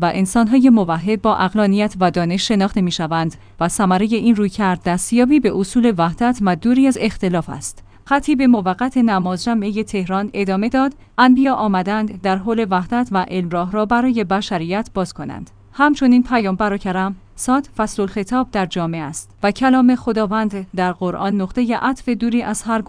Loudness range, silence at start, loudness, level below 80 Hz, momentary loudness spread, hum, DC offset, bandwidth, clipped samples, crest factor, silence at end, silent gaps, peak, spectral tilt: 3 LU; 0 s; -17 LUFS; -42 dBFS; 8 LU; none; under 0.1%; 10.5 kHz; under 0.1%; 16 dB; 0 s; none; 0 dBFS; -5.5 dB/octave